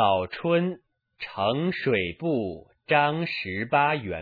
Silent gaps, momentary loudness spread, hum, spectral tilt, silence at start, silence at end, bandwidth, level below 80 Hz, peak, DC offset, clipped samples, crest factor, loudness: none; 13 LU; none; -8.5 dB/octave; 0 s; 0 s; 4.9 kHz; -60 dBFS; -8 dBFS; under 0.1%; under 0.1%; 18 dB; -25 LUFS